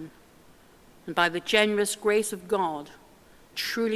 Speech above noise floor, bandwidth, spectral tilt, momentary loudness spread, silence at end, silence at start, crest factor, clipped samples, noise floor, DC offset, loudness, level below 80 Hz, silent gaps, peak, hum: 29 dB; 16 kHz; -3 dB/octave; 19 LU; 0 s; 0 s; 22 dB; under 0.1%; -55 dBFS; under 0.1%; -26 LUFS; -64 dBFS; none; -6 dBFS; none